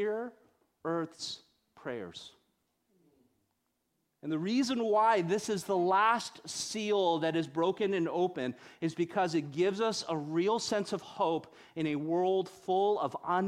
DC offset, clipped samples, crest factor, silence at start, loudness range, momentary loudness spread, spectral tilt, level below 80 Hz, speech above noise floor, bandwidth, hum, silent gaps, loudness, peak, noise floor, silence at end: under 0.1%; under 0.1%; 18 dB; 0 s; 12 LU; 13 LU; -4.5 dB/octave; -76 dBFS; 49 dB; 14.5 kHz; none; none; -32 LUFS; -14 dBFS; -80 dBFS; 0 s